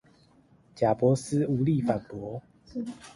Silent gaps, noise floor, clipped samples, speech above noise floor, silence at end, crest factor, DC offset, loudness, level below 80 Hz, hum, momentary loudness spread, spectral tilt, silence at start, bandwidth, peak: none; -60 dBFS; under 0.1%; 33 dB; 0.05 s; 18 dB; under 0.1%; -28 LUFS; -60 dBFS; none; 15 LU; -7.5 dB/octave; 0.75 s; 11.5 kHz; -10 dBFS